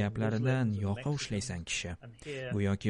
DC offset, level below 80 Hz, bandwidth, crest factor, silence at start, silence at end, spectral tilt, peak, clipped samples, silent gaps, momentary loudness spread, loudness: under 0.1%; -56 dBFS; 11 kHz; 16 dB; 0 s; 0 s; -5.5 dB/octave; -16 dBFS; under 0.1%; none; 12 LU; -34 LUFS